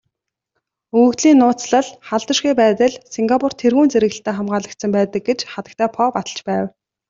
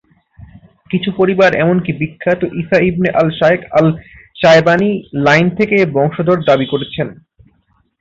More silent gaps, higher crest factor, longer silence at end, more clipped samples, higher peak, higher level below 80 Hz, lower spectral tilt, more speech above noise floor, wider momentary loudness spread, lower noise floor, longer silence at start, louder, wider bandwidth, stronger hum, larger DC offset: neither; about the same, 14 dB vs 14 dB; second, 0.4 s vs 0.85 s; neither; about the same, -2 dBFS vs 0 dBFS; second, -60 dBFS vs -46 dBFS; second, -4.5 dB/octave vs -7 dB/octave; first, 60 dB vs 45 dB; about the same, 10 LU vs 9 LU; first, -76 dBFS vs -58 dBFS; about the same, 0.95 s vs 0.9 s; second, -17 LUFS vs -13 LUFS; about the same, 7.8 kHz vs 7.6 kHz; neither; neither